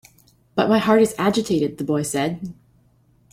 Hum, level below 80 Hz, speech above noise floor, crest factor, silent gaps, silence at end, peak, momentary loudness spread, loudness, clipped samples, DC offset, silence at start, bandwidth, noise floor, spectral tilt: none; -58 dBFS; 39 dB; 18 dB; none; 0.8 s; -4 dBFS; 11 LU; -20 LUFS; under 0.1%; under 0.1%; 0.55 s; 16 kHz; -58 dBFS; -5.5 dB/octave